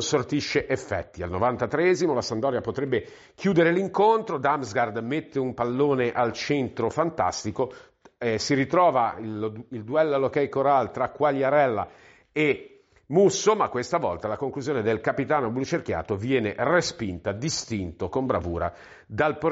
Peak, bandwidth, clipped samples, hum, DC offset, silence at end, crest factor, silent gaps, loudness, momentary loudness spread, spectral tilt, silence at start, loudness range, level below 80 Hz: -8 dBFS; 8 kHz; under 0.1%; none; under 0.1%; 0 s; 16 dB; none; -25 LUFS; 9 LU; -4.5 dB/octave; 0 s; 3 LU; -54 dBFS